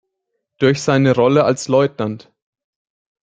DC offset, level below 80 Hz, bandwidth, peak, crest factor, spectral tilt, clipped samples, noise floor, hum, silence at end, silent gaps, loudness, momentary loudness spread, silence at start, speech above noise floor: under 0.1%; -58 dBFS; 9.4 kHz; -2 dBFS; 16 dB; -6 dB/octave; under 0.1%; -75 dBFS; none; 1.05 s; none; -16 LUFS; 12 LU; 0.6 s; 60 dB